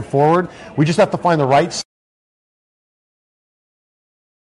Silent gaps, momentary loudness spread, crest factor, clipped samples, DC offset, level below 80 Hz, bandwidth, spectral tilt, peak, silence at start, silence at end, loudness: none; 12 LU; 16 dB; under 0.1%; under 0.1%; -56 dBFS; 11.5 kHz; -6 dB/octave; -2 dBFS; 0 s; 2.7 s; -16 LUFS